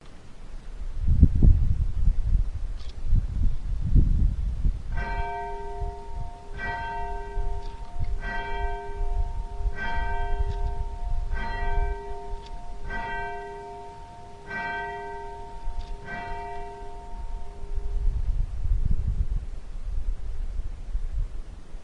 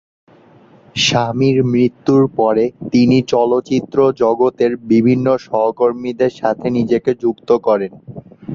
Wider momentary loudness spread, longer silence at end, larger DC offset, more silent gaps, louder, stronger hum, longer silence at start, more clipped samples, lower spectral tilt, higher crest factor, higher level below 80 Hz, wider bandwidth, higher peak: first, 15 LU vs 6 LU; about the same, 0 s vs 0 s; neither; neither; second, -31 LUFS vs -15 LUFS; neither; second, 0 s vs 0.95 s; neither; first, -7.5 dB/octave vs -6 dB/octave; first, 24 dB vs 14 dB; first, -28 dBFS vs -52 dBFS; second, 6 kHz vs 7.6 kHz; about the same, -2 dBFS vs -2 dBFS